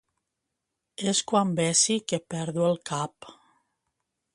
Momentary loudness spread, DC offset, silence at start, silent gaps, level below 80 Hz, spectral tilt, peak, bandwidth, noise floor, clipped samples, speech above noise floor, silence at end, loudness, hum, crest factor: 11 LU; under 0.1%; 1 s; none; -70 dBFS; -3.5 dB/octave; -8 dBFS; 11.5 kHz; -83 dBFS; under 0.1%; 57 dB; 1.05 s; -26 LUFS; none; 22 dB